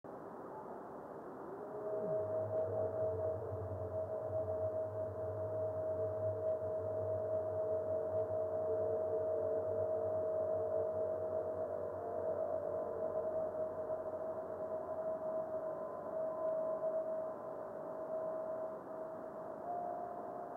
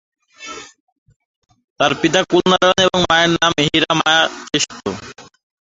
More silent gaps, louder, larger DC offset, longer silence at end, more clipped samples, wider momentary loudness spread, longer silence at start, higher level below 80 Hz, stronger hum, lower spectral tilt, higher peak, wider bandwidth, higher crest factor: second, none vs 0.80-1.06 s, 1.16-1.42 s, 1.64-1.76 s; second, -40 LUFS vs -15 LUFS; neither; second, 0 s vs 0.4 s; neither; second, 9 LU vs 19 LU; second, 0.05 s vs 0.4 s; second, -80 dBFS vs -48 dBFS; neither; first, -10 dB/octave vs -3.5 dB/octave; second, -26 dBFS vs 0 dBFS; second, 2.2 kHz vs 8 kHz; second, 12 dB vs 18 dB